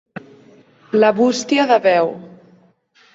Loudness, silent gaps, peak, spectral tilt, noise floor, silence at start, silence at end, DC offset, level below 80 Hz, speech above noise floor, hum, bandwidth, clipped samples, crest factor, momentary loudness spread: -16 LUFS; none; -2 dBFS; -4.5 dB/octave; -54 dBFS; 0.15 s; 0.85 s; under 0.1%; -66 dBFS; 39 dB; none; 8 kHz; under 0.1%; 16 dB; 23 LU